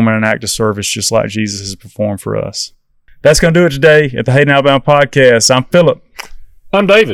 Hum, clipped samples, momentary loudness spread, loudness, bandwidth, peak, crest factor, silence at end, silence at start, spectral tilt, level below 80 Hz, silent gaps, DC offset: none; 1%; 13 LU; -11 LUFS; 19 kHz; 0 dBFS; 12 dB; 0 s; 0 s; -4.5 dB/octave; -36 dBFS; none; under 0.1%